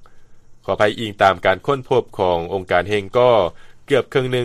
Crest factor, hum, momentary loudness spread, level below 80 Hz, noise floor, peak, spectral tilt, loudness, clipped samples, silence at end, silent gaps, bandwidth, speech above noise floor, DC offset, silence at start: 18 dB; none; 6 LU; -48 dBFS; -41 dBFS; 0 dBFS; -6 dB/octave; -18 LUFS; under 0.1%; 0 s; none; 13 kHz; 23 dB; under 0.1%; 0 s